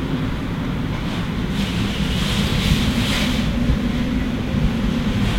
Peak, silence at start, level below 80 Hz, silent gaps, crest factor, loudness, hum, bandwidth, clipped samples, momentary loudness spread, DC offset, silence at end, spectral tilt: -4 dBFS; 0 s; -26 dBFS; none; 16 dB; -21 LUFS; none; 16.5 kHz; under 0.1%; 5 LU; under 0.1%; 0 s; -5.5 dB/octave